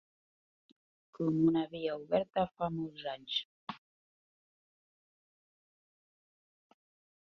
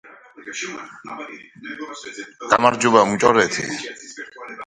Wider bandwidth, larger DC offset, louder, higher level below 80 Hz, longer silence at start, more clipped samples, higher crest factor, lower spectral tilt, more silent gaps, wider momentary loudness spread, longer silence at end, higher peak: second, 6.2 kHz vs 11 kHz; neither; second, -34 LUFS vs -18 LUFS; second, -72 dBFS vs -60 dBFS; first, 1.2 s vs 0.05 s; neither; about the same, 22 dB vs 22 dB; first, -5 dB/octave vs -3.5 dB/octave; first, 3.45-3.67 s vs none; second, 17 LU vs 20 LU; first, 3.45 s vs 0.05 s; second, -16 dBFS vs 0 dBFS